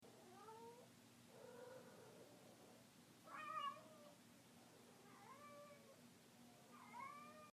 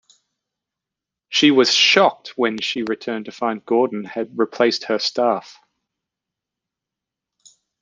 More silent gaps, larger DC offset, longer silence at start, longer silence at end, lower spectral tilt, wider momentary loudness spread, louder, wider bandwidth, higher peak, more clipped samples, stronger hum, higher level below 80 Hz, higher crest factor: neither; neither; second, 0 s vs 1.3 s; second, 0.05 s vs 2.3 s; about the same, -3.5 dB/octave vs -3 dB/octave; about the same, 14 LU vs 13 LU; second, -60 LUFS vs -18 LUFS; first, 15.5 kHz vs 9.8 kHz; second, -38 dBFS vs -2 dBFS; neither; neither; second, under -90 dBFS vs -70 dBFS; about the same, 22 dB vs 20 dB